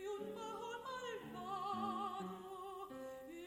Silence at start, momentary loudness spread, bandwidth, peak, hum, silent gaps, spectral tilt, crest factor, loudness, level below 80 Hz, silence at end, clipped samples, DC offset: 0 s; 8 LU; 16 kHz; -30 dBFS; none; none; -4.5 dB/octave; 16 dB; -46 LUFS; -78 dBFS; 0 s; under 0.1%; under 0.1%